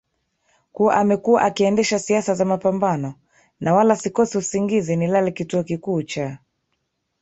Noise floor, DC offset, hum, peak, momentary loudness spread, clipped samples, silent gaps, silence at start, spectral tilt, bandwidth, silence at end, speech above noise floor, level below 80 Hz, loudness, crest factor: -73 dBFS; under 0.1%; none; -2 dBFS; 9 LU; under 0.1%; none; 0.75 s; -5.5 dB/octave; 8.2 kHz; 0.85 s; 54 dB; -60 dBFS; -20 LUFS; 18 dB